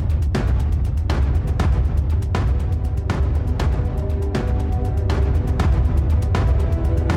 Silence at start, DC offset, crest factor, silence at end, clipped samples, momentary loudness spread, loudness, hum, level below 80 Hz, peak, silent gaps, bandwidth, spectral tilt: 0 s; under 0.1%; 12 dB; 0 s; under 0.1%; 3 LU; -21 LUFS; none; -22 dBFS; -6 dBFS; none; 9 kHz; -8 dB/octave